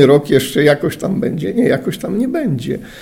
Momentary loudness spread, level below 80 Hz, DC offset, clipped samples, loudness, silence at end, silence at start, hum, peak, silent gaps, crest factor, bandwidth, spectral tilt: 7 LU; -46 dBFS; under 0.1%; under 0.1%; -16 LUFS; 0 s; 0 s; none; 0 dBFS; none; 14 dB; 16.5 kHz; -6 dB/octave